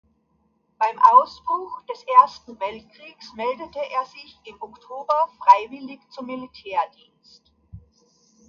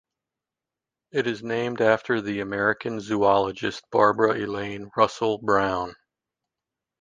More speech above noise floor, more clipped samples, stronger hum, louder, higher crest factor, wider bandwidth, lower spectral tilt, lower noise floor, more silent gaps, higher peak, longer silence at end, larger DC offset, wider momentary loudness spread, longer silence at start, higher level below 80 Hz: second, 45 dB vs 65 dB; neither; neither; first, -20 LUFS vs -24 LUFS; about the same, 22 dB vs 22 dB; second, 7 kHz vs 9.6 kHz; about the same, -4.5 dB/octave vs -5.5 dB/octave; second, -67 dBFS vs -88 dBFS; neither; about the same, -2 dBFS vs -4 dBFS; second, 0.7 s vs 1.1 s; neither; first, 23 LU vs 10 LU; second, 0.8 s vs 1.15 s; about the same, -62 dBFS vs -58 dBFS